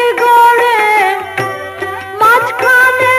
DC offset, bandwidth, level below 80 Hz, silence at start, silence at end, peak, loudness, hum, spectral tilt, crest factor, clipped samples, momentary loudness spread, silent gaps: under 0.1%; 14 kHz; -56 dBFS; 0 s; 0 s; 0 dBFS; -9 LUFS; none; -2.5 dB/octave; 10 dB; under 0.1%; 14 LU; none